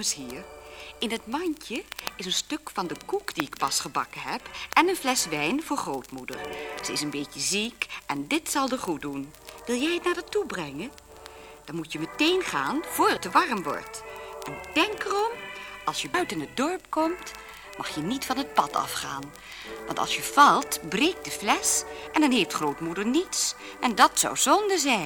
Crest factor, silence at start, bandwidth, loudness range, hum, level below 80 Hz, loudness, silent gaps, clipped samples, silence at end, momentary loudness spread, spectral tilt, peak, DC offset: 24 dB; 0 s; over 20 kHz; 6 LU; none; -58 dBFS; -26 LUFS; none; under 0.1%; 0 s; 16 LU; -2 dB/octave; -2 dBFS; under 0.1%